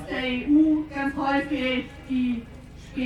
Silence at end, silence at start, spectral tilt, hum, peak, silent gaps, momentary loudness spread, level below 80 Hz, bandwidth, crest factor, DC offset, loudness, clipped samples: 0 s; 0 s; -6 dB/octave; 50 Hz at -50 dBFS; -12 dBFS; none; 15 LU; -46 dBFS; 8.8 kHz; 14 dB; under 0.1%; -25 LUFS; under 0.1%